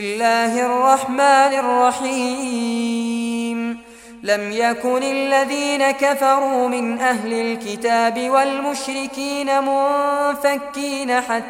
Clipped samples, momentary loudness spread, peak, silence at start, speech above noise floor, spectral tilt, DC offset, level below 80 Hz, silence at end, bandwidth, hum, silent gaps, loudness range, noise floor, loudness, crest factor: under 0.1%; 8 LU; -2 dBFS; 0 s; 20 dB; -3 dB/octave; under 0.1%; -60 dBFS; 0 s; 16.5 kHz; none; none; 3 LU; -39 dBFS; -18 LUFS; 16 dB